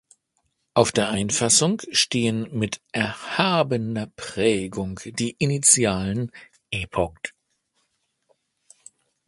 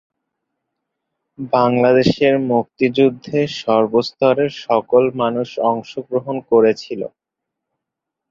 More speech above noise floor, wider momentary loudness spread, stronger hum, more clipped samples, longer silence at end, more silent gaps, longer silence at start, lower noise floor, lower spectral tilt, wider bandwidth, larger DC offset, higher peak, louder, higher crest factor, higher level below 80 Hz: second, 50 dB vs 65 dB; first, 13 LU vs 10 LU; neither; neither; first, 2 s vs 1.25 s; neither; second, 0.75 s vs 1.4 s; second, -73 dBFS vs -82 dBFS; second, -3.5 dB/octave vs -7 dB/octave; first, 11.5 kHz vs 7.6 kHz; neither; about the same, 0 dBFS vs -2 dBFS; second, -22 LUFS vs -17 LUFS; first, 24 dB vs 16 dB; first, -50 dBFS vs -56 dBFS